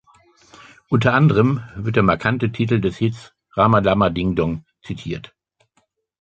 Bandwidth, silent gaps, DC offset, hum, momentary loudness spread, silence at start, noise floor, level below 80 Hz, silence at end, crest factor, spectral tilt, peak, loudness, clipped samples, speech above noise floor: 8 kHz; none; under 0.1%; none; 16 LU; 0.9 s; -66 dBFS; -44 dBFS; 1 s; 18 dB; -8 dB/octave; -2 dBFS; -19 LUFS; under 0.1%; 48 dB